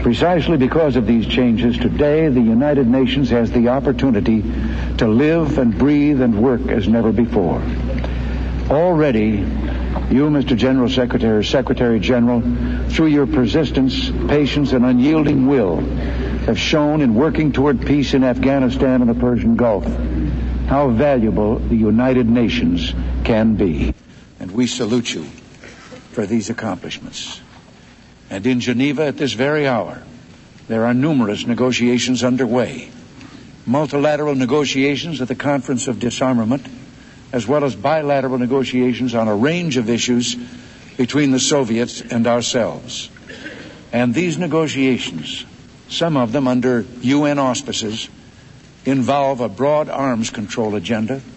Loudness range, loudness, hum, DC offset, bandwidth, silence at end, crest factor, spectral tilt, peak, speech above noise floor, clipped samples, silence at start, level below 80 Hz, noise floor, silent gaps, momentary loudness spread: 5 LU; -17 LUFS; none; under 0.1%; 8.4 kHz; 0.05 s; 14 dB; -6 dB/octave; -4 dBFS; 28 dB; under 0.1%; 0 s; -30 dBFS; -44 dBFS; none; 10 LU